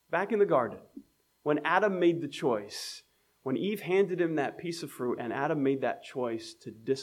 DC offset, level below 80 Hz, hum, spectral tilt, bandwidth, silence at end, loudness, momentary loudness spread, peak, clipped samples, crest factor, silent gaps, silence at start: under 0.1%; -80 dBFS; none; -5.5 dB/octave; 15.5 kHz; 0 s; -30 LUFS; 13 LU; -10 dBFS; under 0.1%; 20 dB; none; 0.1 s